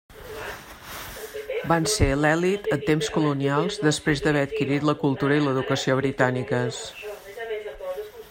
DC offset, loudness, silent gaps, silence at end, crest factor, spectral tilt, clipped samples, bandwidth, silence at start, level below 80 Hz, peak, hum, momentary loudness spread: under 0.1%; -24 LUFS; none; 0 s; 20 dB; -5 dB/octave; under 0.1%; 16.5 kHz; 0.1 s; -42 dBFS; -6 dBFS; none; 15 LU